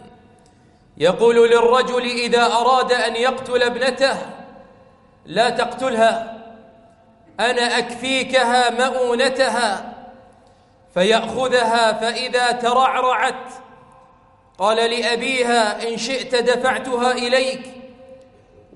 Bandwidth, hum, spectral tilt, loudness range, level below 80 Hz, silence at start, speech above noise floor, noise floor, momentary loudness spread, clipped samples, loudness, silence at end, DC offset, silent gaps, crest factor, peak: 11.5 kHz; none; -3 dB/octave; 4 LU; -58 dBFS; 0 s; 34 dB; -52 dBFS; 9 LU; under 0.1%; -18 LUFS; 0.6 s; under 0.1%; none; 16 dB; -2 dBFS